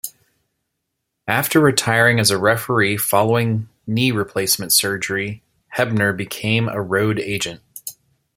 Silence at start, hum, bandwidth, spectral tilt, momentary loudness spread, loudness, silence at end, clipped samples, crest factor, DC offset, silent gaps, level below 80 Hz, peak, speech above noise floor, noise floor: 0.05 s; none; 16.5 kHz; -4 dB/octave; 14 LU; -18 LUFS; 0.45 s; under 0.1%; 18 dB; under 0.1%; none; -56 dBFS; -2 dBFS; 59 dB; -77 dBFS